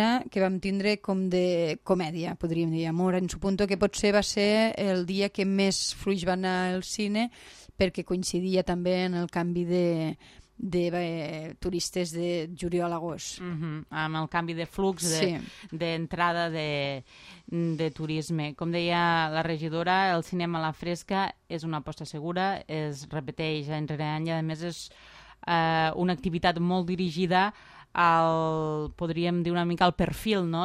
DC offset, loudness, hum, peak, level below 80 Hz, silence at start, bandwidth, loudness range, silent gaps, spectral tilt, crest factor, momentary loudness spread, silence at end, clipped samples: under 0.1%; -28 LUFS; none; -8 dBFS; -52 dBFS; 0 s; 14.5 kHz; 6 LU; none; -5 dB/octave; 20 dB; 10 LU; 0 s; under 0.1%